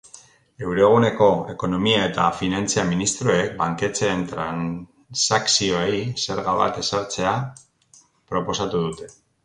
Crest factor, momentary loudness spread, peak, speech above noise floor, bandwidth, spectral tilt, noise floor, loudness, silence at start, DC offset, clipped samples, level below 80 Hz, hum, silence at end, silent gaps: 18 dB; 11 LU; -4 dBFS; 34 dB; 11 kHz; -4 dB/octave; -55 dBFS; -21 LUFS; 0.15 s; under 0.1%; under 0.1%; -50 dBFS; none; 0.35 s; none